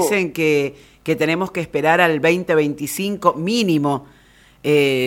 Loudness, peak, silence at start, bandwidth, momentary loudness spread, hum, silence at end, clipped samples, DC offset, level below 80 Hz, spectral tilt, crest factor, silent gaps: -18 LUFS; 0 dBFS; 0 s; 17 kHz; 9 LU; none; 0 s; under 0.1%; under 0.1%; -56 dBFS; -5 dB/octave; 18 dB; none